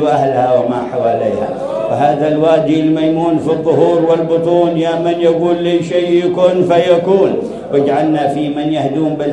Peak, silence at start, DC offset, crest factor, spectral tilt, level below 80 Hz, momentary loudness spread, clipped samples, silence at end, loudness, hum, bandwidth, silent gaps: 0 dBFS; 0 s; under 0.1%; 12 dB; -7.5 dB/octave; -50 dBFS; 5 LU; under 0.1%; 0 s; -13 LUFS; none; 10.5 kHz; none